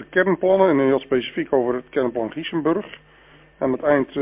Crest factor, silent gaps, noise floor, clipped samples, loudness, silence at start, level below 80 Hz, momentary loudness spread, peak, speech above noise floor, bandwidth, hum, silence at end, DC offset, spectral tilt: 18 dB; none; -50 dBFS; under 0.1%; -21 LUFS; 0 s; -56 dBFS; 9 LU; -4 dBFS; 30 dB; 3.8 kHz; none; 0 s; under 0.1%; -10 dB/octave